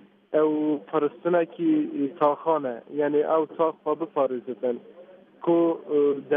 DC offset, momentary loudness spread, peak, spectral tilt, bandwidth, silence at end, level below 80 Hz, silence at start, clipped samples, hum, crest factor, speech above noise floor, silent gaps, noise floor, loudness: under 0.1%; 7 LU; -8 dBFS; -6 dB/octave; 3.7 kHz; 0 s; -84 dBFS; 0.3 s; under 0.1%; none; 16 dB; 20 dB; none; -44 dBFS; -25 LUFS